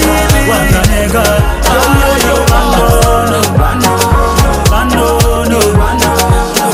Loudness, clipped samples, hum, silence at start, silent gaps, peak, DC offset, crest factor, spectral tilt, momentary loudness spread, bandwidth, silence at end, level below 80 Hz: -9 LUFS; 0.8%; none; 0 s; none; 0 dBFS; under 0.1%; 8 dB; -4.5 dB/octave; 2 LU; 16.5 kHz; 0 s; -14 dBFS